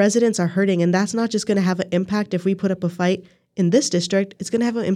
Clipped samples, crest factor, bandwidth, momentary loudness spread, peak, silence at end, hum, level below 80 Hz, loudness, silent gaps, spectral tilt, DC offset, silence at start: under 0.1%; 14 dB; 12.5 kHz; 5 LU; -4 dBFS; 0 s; none; -64 dBFS; -20 LUFS; none; -5.5 dB/octave; under 0.1%; 0 s